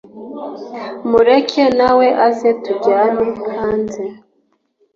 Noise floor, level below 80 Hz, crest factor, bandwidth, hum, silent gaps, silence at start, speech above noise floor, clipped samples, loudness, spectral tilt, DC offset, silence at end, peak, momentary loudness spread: -62 dBFS; -50 dBFS; 14 dB; 7.4 kHz; none; none; 0.15 s; 48 dB; under 0.1%; -14 LUFS; -5.5 dB/octave; under 0.1%; 0.8 s; -2 dBFS; 17 LU